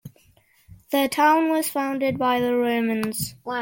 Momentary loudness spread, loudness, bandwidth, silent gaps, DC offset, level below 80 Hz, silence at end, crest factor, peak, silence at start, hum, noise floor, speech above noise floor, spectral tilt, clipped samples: 8 LU; -22 LUFS; 17 kHz; none; under 0.1%; -60 dBFS; 0 s; 18 dB; -6 dBFS; 0.05 s; none; -59 dBFS; 37 dB; -4 dB/octave; under 0.1%